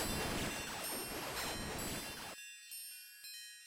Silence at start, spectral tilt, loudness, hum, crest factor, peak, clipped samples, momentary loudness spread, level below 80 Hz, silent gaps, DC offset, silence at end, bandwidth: 0 s; -2.5 dB/octave; -42 LUFS; none; 16 dB; -28 dBFS; under 0.1%; 10 LU; -56 dBFS; none; under 0.1%; 0 s; 16 kHz